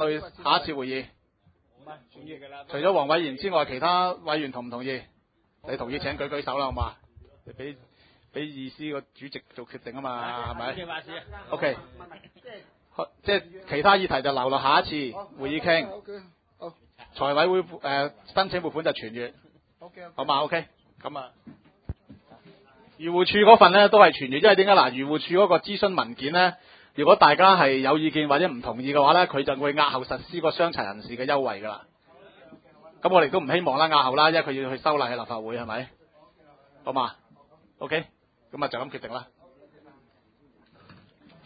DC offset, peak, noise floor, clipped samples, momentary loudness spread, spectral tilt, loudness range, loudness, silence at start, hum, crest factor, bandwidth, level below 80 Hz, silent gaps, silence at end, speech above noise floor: under 0.1%; 0 dBFS; -68 dBFS; under 0.1%; 22 LU; -9 dB/octave; 15 LU; -23 LUFS; 0 s; none; 24 dB; 5 kHz; -54 dBFS; none; 2.25 s; 44 dB